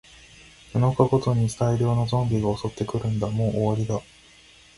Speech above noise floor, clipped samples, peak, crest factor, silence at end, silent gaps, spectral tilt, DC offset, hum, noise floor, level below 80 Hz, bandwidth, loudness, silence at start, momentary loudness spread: 29 dB; under 0.1%; -4 dBFS; 20 dB; 0.75 s; none; -7.5 dB/octave; under 0.1%; none; -52 dBFS; -48 dBFS; 11.5 kHz; -24 LUFS; 0.75 s; 8 LU